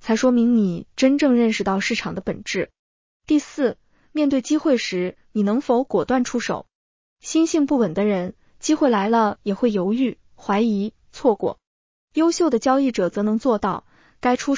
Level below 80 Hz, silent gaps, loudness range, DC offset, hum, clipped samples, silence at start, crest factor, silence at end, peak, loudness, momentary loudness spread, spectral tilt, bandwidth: -56 dBFS; 2.79-3.20 s, 6.75-7.16 s, 11.67-12.08 s; 2 LU; under 0.1%; none; under 0.1%; 0.05 s; 16 dB; 0 s; -4 dBFS; -21 LUFS; 10 LU; -5 dB/octave; 7.6 kHz